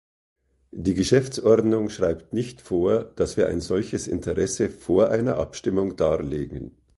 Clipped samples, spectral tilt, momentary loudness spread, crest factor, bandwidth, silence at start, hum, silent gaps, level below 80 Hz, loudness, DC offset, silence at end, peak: under 0.1%; -6 dB/octave; 10 LU; 20 dB; 11.5 kHz; 0.75 s; none; none; -44 dBFS; -24 LUFS; under 0.1%; 0.3 s; -4 dBFS